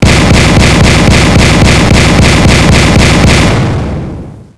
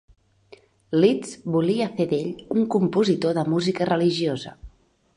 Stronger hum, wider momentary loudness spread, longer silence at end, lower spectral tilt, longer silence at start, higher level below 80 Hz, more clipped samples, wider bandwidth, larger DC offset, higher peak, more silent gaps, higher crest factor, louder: neither; about the same, 9 LU vs 7 LU; second, 0 s vs 0.5 s; second, -5 dB/octave vs -6.5 dB/octave; second, 0 s vs 0.9 s; first, -12 dBFS vs -56 dBFS; first, 0.9% vs under 0.1%; about the same, 11 kHz vs 11 kHz; first, 5% vs under 0.1%; first, 0 dBFS vs -6 dBFS; neither; second, 6 dB vs 18 dB; first, -5 LUFS vs -23 LUFS